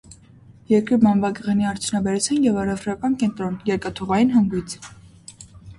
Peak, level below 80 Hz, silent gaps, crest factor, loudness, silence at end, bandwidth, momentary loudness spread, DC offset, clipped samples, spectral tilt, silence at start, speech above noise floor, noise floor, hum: -4 dBFS; -50 dBFS; none; 16 dB; -21 LUFS; 0.05 s; 11.5 kHz; 14 LU; under 0.1%; under 0.1%; -5.5 dB/octave; 0.1 s; 28 dB; -48 dBFS; none